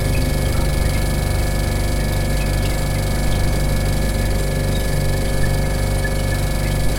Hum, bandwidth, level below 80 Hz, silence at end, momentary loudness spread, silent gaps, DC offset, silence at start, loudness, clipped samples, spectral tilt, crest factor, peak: none; 17 kHz; -20 dBFS; 0 s; 1 LU; none; under 0.1%; 0 s; -20 LUFS; under 0.1%; -5.5 dB/octave; 12 dB; -4 dBFS